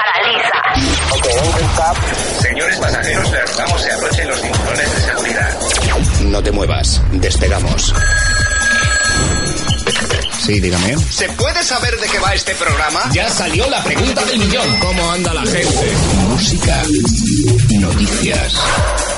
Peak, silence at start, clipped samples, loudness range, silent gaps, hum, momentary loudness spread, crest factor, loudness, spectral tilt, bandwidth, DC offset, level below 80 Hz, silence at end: -2 dBFS; 0 s; under 0.1%; 1 LU; none; none; 3 LU; 12 dB; -14 LUFS; -3.5 dB/octave; 11.5 kHz; under 0.1%; -20 dBFS; 0 s